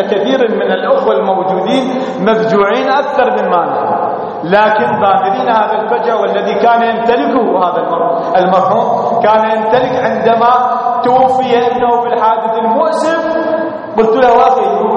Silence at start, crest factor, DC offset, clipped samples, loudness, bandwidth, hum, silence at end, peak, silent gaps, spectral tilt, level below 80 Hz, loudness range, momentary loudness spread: 0 s; 10 dB; under 0.1%; under 0.1%; -11 LUFS; 9.8 kHz; none; 0 s; 0 dBFS; none; -6 dB/octave; -52 dBFS; 1 LU; 4 LU